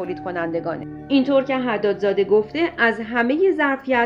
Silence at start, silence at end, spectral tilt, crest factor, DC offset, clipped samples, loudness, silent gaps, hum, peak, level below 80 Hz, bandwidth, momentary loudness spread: 0 s; 0 s; -7 dB/octave; 16 dB; under 0.1%; under 0.1%; -20 LUFS; none; none; -4 dBFS; -54 dBFS; 7.2 kHz; 8 LU